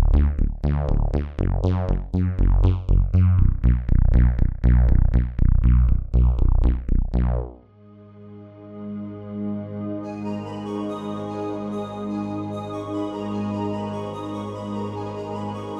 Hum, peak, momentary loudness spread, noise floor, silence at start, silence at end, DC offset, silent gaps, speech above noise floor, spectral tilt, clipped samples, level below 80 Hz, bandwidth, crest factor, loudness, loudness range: none; -4 dBFS; 12 LU; -47 dBFS; 0 s; 0 s; under 0.1%; none; 28 dB; -9.5 dB/octave; under 0.1%; -22 dBFS; 5 kHz; 16 dB; -24 LUFS; 10 LU